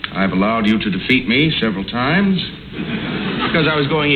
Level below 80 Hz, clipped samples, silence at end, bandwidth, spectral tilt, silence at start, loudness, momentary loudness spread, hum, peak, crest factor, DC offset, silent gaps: -42 dBFS; under 0.1%; 0 s; 6 kHz; -7.5 dB/octave; 0 s; -17 LUFS; 8 LU; none; -2 dBFS; 14 dB; under 0.1%; none